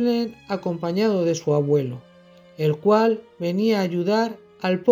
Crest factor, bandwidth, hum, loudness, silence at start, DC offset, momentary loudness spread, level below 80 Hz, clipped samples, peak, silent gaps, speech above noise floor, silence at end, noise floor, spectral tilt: 18 dB; 19 kHz; none; -22 LUFS; 0 s; under 0.1%; 9 LU; -68 dBFS; under 0.1%; -4 dBFS; none; 29 dB; 0 s; -50 dBFS; -6.5 dB/octave